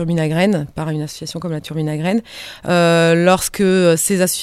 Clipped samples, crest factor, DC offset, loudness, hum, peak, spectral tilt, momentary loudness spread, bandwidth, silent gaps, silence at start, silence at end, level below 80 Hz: under 0.1%; 16 dB; under 0.1%; -16 LUFS; none; 0 dBFS; -5 dB/octave; 12 LU; 16 kHz; none; 0 s; 0 s; -48 dBFS